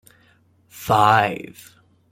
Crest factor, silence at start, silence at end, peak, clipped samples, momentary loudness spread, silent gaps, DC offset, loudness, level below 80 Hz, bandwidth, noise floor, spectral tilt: 20 dB; 0.75 s; 0.7 s; -2 dBFS; under 0.1%; 20 LU; none; under 0.1%; -17 LUFS; -56 dBFS; 16.5 kHz; -58 dBFS; -5 dB/octave